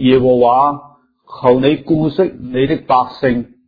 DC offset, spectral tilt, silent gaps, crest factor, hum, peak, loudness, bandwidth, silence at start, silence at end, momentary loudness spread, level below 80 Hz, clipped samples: under 0.1%; -9.5 dB/octave; none; 14 dB; none; 0 dBFS; -14 LUFS; 5 kHz; 0 s; 0.25 s; 7 LU; -44 dBFS; under 0.1%